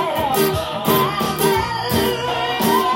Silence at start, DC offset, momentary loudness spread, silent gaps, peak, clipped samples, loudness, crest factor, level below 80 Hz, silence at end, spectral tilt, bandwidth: 0 s; under 0.1%; 3 LU; none; -2 dBFS; under 0.1%; -18 LUFS; 16 dB; -42 dBFS; 0 s; -4 dB/octave; 17 kHz